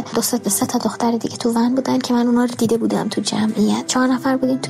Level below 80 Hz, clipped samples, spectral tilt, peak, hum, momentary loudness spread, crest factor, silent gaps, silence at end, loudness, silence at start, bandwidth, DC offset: -58 dBFS; under 0.1%; -4 dB/octave; -6 dBFS; none; 3 LU; 12 dB; none; 0 s; -18 LUFS; 0 s; 16 kHz; under 0.1%